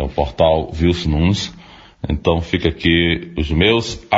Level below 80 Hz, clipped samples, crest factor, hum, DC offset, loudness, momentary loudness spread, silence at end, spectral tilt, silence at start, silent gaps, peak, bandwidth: -28 dBFS; under 0.1%; 16 dB; none; under 0.1%; -17 LUFS; 7 LU; 0 s; -6 dB/octave; 0 s; none; 0 dBFS; 8 kHz